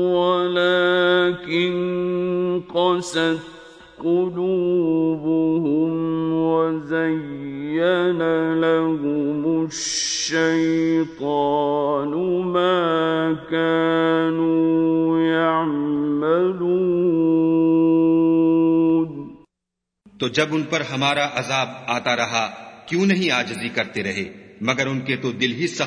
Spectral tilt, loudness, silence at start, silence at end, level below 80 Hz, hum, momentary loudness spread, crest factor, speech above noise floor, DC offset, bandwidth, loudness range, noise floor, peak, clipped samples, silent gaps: -5 dB/octave; -20 LUFS; 0 s; 0 s; -60 dBFS; none; 7 LU; 18 dB; 62 dB; under 0.1%; 10 kHz; 4 LU; -82 dBFS; -2 dBFS; under 0.1%; none